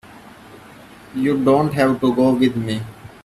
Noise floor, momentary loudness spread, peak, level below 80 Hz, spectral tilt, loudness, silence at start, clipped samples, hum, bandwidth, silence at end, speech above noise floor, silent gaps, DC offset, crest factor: -42 dBFS; 12 LU; -4 dBFS; -52 dBFS; -7 dB/octave; -18 LUFS; 0.1 s; under 0.1%; none; 13.5 kHz; 0.15 s; 25 dB; none; under 0.1%; 16 dB